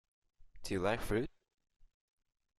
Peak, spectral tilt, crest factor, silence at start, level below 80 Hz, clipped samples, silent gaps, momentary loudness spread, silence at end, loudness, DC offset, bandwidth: -20 dBFS; -5.5 dB/octave; 20 dB; 0.4 s; -54 dBFS; under 0.1%; none; 11 LU; 1.3 s; -37 LUFS; under 0.1%; 14 kHz